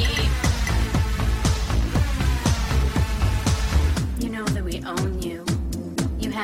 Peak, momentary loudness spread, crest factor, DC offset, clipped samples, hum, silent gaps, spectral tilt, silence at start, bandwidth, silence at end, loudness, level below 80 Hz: -6 dBFS; 5 LU; 16 dB; under 0.1%; under 0.1%; none; none; -5 dB/octave; 0 s; 16 kHz; 0 s; -24 LUFS; -24 dBFS